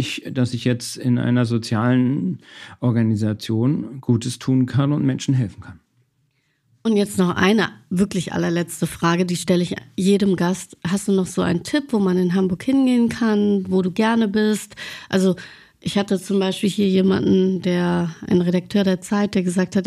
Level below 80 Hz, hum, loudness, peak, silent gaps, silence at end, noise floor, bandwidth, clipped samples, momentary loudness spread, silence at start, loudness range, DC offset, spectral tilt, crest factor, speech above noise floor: -56 dBFS; none; -20 LUFS; -4 dBFS; none; 0 s; -66 dBFS; 14 kHz; under 0.1%; 7 LU; 0 s; 3 LU; under 0.1%; -6.5 dB/octave; 14 dB; 47 dB